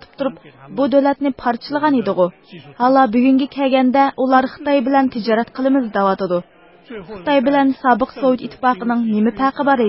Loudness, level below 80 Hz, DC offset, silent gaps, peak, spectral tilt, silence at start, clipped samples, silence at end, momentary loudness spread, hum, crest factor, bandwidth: -17 LUFS; -54 dBFS; under 0.1%; none; -2 dBFS; -10.5 dB/octave; 0.2 s; under 0.1%; 0 s; 8 LU; none; 16 dB; 5.8 kHz